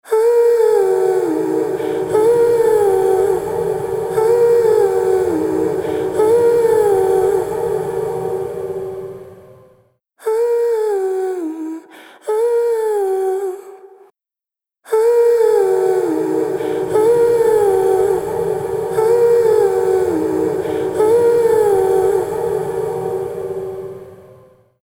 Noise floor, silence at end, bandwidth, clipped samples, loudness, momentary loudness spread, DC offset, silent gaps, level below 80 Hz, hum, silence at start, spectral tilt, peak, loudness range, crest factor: -89 dBFS; 0.6 s; 17 kHz; under 0.1%; -16 LUFS; 11 LU; under 0.1%; none; -52 dBFS; none; 0.05 s; -6 dB/octave; -2 dBFS; 7 LU; 12 dB